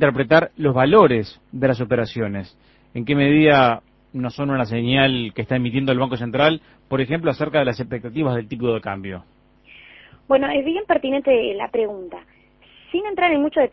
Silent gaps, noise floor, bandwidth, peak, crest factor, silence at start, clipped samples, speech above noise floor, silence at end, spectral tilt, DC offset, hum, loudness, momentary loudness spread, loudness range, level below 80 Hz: none; -52 dBFS; 6 kHz; 0 dBFS; 20 dB; 0 s; under 0.1%; 33 dB; 0.05 s; -8.5 dB/octave; under 0.1%; none; -19 LUFS; 14 LU; 5 LU; -50 dBFS